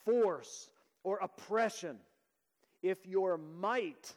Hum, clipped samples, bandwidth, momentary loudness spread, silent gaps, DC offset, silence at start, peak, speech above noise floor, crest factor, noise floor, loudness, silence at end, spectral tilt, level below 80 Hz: none; under 0.1%; 15.5 kHz; 13 LU; none; under 0.1%; 0.05 s; -22 dBFS; 45 dB; 16 dB; -80 dBFS; -36 LUFS; 0.05 s; -4.5 dB/octave; under -90 dBFS